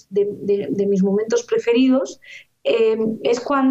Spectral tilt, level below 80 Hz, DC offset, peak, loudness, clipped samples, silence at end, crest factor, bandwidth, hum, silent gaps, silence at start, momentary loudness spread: -6 dB/octave; -64 dBFS; under 0.1%; -6 dBFS; -19 LUFS; under 0.1%; 0 s; 12 dB; 8.2 kHz; none; none; 0.1 s; 6 LU